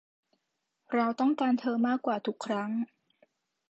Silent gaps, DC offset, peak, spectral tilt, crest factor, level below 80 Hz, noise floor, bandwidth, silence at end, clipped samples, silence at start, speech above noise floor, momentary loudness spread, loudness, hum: none; under 0.1%; -16 dBFS; -6 dB/octave; 16 dB; -84 dBFS; -82 dBFS; 8.2 kHz; 0.85 s; under 0.1%; 0.9 s; 53 dB; 7 LU; -30 LUFS; none